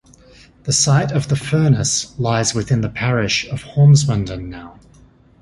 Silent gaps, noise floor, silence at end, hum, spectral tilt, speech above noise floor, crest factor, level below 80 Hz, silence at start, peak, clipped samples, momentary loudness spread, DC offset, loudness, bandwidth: none; -48 dBFS; 0.7 s; none; -4.5 dB/octave; 32 dB; 14 dB; -42 dBFS; 0.65 s; -2 dBFS; under 0.1%; 14 LU; under 0.1%; -17 LUFS; 11.5 kHz